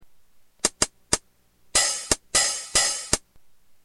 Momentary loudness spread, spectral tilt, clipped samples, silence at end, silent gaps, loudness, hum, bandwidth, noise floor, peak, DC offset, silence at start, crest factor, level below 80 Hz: 6 LU; 0 dB/octave; under 0.1%; 0.65 s; none; -23 LUFS; none; 16.5 kHz; -59 dBFS; -2 dBFS; under 0.1%; 0.65 s; 26 dB; -46 dBFS